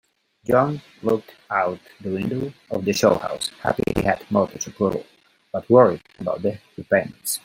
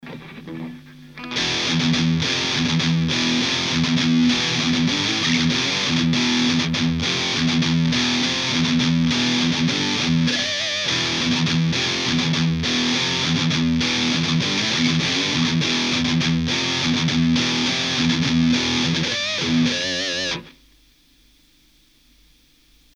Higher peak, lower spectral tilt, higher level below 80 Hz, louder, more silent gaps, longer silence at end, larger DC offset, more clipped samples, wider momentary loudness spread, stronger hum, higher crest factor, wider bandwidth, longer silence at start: first, -2 dBFS vs -6 dBFS; about the same, -5 dB/octave vs -4 dB/octave; about the same, -50 dBFS vs -46 dBFS; second, -22 LUFS vs -19 LUFS; neither; second, 0.05 s vs 2.45 s; neither; neither; first, 12 LU vs 2 LU; neither; about the same, 20 dB vs 16 dB; first, 16.5 kHz vs 10 kHz; first, 0.5 s vs 0.05 s